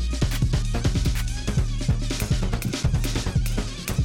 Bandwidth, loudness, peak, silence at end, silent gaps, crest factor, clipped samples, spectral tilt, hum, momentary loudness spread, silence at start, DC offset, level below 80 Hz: 17 kHz; -26 LUFS; -12 dBFS; 0 s; none; 12 dB; under 0.1%; -5 dB/octave; none; 3 LU; 0 s; under 0.1%; -26 dBFS